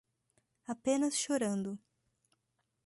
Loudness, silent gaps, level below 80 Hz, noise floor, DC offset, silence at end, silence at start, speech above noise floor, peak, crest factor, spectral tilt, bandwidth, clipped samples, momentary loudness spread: -34 LUFS; none; -78 dBFS; -82 dBFS; under 0.1%; 1.1 s; 0.7 s; 48 dB; -20 dBFS; 18 dB; -4 dB/octave; 11.5 kHz; under 0.1%; 16 LU